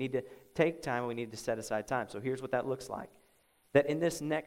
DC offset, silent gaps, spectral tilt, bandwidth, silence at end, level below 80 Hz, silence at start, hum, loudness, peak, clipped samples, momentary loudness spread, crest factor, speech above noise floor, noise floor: under 0.1%; none; -5.5 dB/octave; 16 kHz; 0 s; -66 dBFS; 0 s; none; -34 LUFS; -12 dBFS; under 0.1%; 10 LU; 22 dB; 35 dB; -69 dBFS